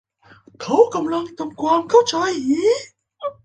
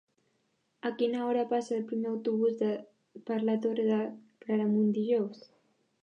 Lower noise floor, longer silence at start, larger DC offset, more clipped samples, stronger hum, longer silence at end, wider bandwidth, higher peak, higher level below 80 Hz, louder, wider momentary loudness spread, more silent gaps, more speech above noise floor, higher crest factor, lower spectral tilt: second, -50 dBFS vs -76 dBFS; second, 0.6 s vs 0.85 s; neither; neither; neither; second, 0.15 s vs 0.65 s; first, 9 kHz vs 7.8 kHz; first, -2 dBFS vs -18 dBFS; first, -64 dBFS vs -86 dBFS; first, -18 LUFS vs -31 LUFS; first, 15 LU vs 10 LU; neither; second, 32 dB vs 46 dB; about the same, 18 dB vs 14 dB; second, -4 dB/octave vs -7.5 dB/octave